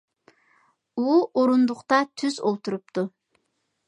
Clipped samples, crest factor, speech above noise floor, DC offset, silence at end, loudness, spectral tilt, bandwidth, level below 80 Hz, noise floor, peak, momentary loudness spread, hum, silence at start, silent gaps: under 0.1%; 20 dB; 52 dB; under 0.1%; 0.8 s; -24 LUFS; -5.5 dB/octave; 10 kHz; -80 dBFS; -75 dBFS; -6 dBFS; 10 LU; none; 0.95 s; none